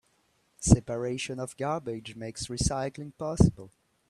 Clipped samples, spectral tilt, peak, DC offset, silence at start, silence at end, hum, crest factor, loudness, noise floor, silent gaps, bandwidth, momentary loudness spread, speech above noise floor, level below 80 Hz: under 0.1%; -5.5 dB/octave; -6 dBFS; under 0.1%; 0.6 s; 0.4 s; none; 24 dB; -29 LUFS; -70 dBFS; none; 12.5 kHz; 13 LU; 42 dB; -40 dBFS